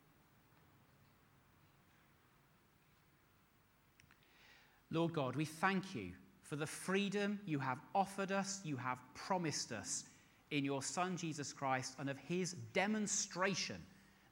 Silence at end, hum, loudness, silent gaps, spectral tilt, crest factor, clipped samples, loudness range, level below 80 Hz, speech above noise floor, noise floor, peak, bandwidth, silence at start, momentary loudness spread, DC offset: 0.35 s; none; -41 LUFS; none; -4 dB/octave; 22 dB; under 0.1%; 3 LU; -78 dBFS; 32 dB; -72 dBFS; -20 dBFS; 18 kHz; 4.1 s; 8 LU; under 0.1%